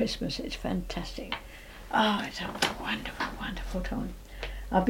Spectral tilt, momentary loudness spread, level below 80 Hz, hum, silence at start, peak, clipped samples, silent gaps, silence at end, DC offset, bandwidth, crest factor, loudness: -4.5 dB/octave; 13 LU; -42 dBFS; none; 0 s; -10 dBFS; under 0.1%; none; 0 s; under 0.1%; 17 kHz; 22 dB; -32 LUFS